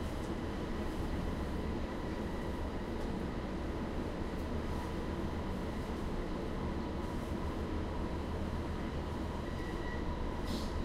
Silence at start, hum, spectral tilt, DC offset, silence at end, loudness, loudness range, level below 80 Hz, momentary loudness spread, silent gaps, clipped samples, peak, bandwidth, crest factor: 0 s; none; -7 dB/octave; under 0.1%; 0 s; -39 LUFS; 0 LU; -42 dBFS; 1 LU; none; under 0.1%; -24 dBFS; 15 kHz; 14 dB